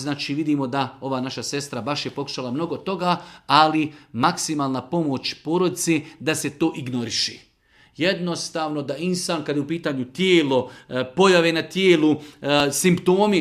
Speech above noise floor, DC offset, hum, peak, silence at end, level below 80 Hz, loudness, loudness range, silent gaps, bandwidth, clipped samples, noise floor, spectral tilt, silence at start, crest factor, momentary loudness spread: 35 dB; under 0.1%; none; 0 dBFS; 0 s; -62 dBFS; -22 LUFS; 6 LU; none; 15.5 kHz; under 0.1%; -57 dBFS; -4.5 dB/octave; 0 s; 20 dB; 10 LU